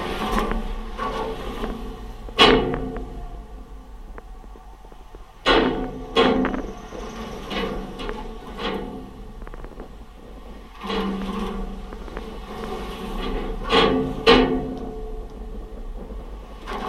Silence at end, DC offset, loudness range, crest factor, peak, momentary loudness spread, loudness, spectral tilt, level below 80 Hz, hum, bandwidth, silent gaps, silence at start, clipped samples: 0 s; under 0.1%; 10 LU; 24 dB; 0 dBFS; 24 LU; -23 LUFS; -5 dB/octave; -34 dBFS; none; 14 kHz; none; 0 s; under 0.1%